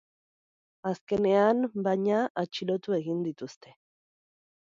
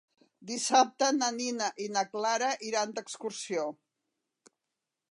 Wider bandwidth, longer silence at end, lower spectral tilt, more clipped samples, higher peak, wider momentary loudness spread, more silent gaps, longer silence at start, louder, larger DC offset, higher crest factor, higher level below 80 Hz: second, 7.6 kHz vs 11.5 kHz; second, 1.15 s vs 1.4 s; first, -7 dB/octave vs -1.5 dB/octave; neither; about the same, -12 dBFS vs -10 dBFS; about the same, 12 LU vs 13 LU; first, 1.01-1.07 s, 2.30-2.35 s vs none; first, 0.85 s vs 0.4 s; about the same, -28 LUFS vs -30 LUFS; neither; about the same, 18 dB vs 22 dB; first, -70 dBFS vs -90 dBFS